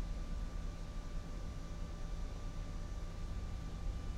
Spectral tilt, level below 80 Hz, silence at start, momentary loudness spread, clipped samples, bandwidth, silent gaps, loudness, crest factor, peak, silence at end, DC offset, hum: -6 dB/octave; -42 dBFS; 0 s; 2 LU; under 0.1%; 11 kHz; none; -47 LUFS; 12 dB; -28 dBFS; 0 s; under 0.1%; none